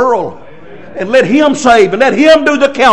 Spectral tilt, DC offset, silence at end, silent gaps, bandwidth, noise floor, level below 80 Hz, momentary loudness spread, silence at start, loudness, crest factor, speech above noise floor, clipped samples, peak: -4 dB/octave; 2%; 0 s; none; 11 kHz; -33 dBFS; -44 dBFS; 14 LU; 0 s; -8 LUFS; 10 dB; 26 dB; 4%; 0 dBFS